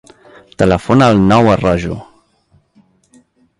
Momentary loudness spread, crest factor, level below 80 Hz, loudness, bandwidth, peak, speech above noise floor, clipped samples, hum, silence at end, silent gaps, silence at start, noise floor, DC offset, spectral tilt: 12 LU; 14 dB; -36 dBFS; -12 LUFS; 11.5 kHz; 0 dBFS; 44 dB; under 0.1%; none; 1.55 s; none; 0.6 s; -55 dBFS; under 0.1%; -7 dB/octave